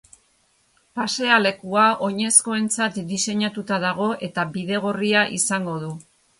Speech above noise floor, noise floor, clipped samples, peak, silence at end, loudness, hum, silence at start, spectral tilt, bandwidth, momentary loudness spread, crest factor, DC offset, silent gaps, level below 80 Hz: 41 dB; -63 dBFS; under 0.1%; -2 dBFS; 0.4 s; -21 LUFS; none; 0.95 s; -3 dB/octave; 11.5 kHz; 11 LU; 22 dB; under 0.1%; none; -66 dBFS